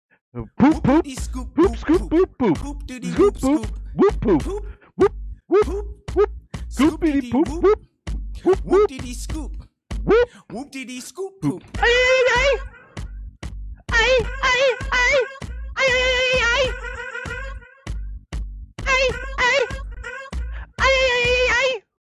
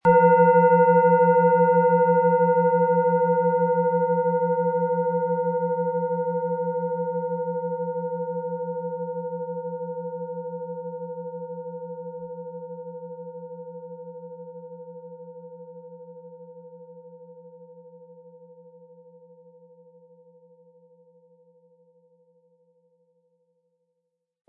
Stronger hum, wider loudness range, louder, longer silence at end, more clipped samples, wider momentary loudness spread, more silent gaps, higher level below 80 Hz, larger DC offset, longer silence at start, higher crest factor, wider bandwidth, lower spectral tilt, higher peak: neither; second, 4 LU vs 24 LU; first, -19 LUFS vs -22 LUFS; second, 0.3 s vs 6.2 s; neither; second, 18 LU vs 25 LU; neither; first, -32 dBFS vs -72 dBFS; neither; first, 0.35 s vs 0.05 s; about the same, 16 dB vs 18 dB; first, 13.5 kHz vs 2.9 kHz; second, -4.5 dB/octave vs -12.5 dB/octave; about the same, -6 dBFS vs -6 dBFS